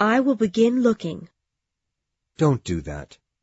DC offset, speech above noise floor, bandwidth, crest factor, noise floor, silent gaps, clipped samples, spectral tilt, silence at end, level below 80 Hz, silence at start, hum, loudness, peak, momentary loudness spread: under 0.1%; 60 dB; 8 kHz; 16 dB; -82 dBFS; none; under 0.1%; -7 dB/octave; 0.4 s; -48 dBFS; 0 s; none; -22 LUFS; -6 dBFS; 17 LU